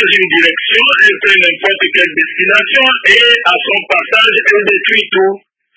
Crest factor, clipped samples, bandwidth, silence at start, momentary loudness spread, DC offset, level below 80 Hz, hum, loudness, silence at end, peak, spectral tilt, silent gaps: 10 dB; 0.8%; 8 kHz; 0 s; 6 LU; under 0.1%; -54 dBFS; none; -8 LUFS; 0.4 s; 0 dBFS; -2.5 dB/octave; none